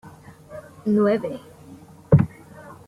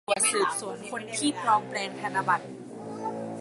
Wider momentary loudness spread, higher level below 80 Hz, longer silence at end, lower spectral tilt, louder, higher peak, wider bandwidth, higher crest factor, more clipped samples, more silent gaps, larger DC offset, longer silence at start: first, 23 LU vs 12 LU; first, -48 dBFS vs -74 dBFS; first, 0.15 s vs 0 s; first, -9.5 dB/octave vs -2.5 dB/octave; first, -21 LUFS vs -28 LUFS; first, -2 dBFS vs -10 dBFS; about the same, 12 kHz vs 12 kHz; about the same, 22 dB vs 18 dB; neither; neither; neither; about the same, 0.05 s vs 0.1 s